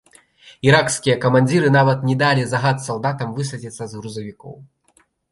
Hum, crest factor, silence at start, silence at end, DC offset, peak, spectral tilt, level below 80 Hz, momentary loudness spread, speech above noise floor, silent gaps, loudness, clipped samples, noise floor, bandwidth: none; 18 dB; 0.45 s; 0.7 s; under 0.1%; -2 dBFS; -5.5 dB/octave; -56 dBFS; 16 LU; 41 dB; none; -17 LUFS; under 0.1%; -60 dBFS; 11.5 kHz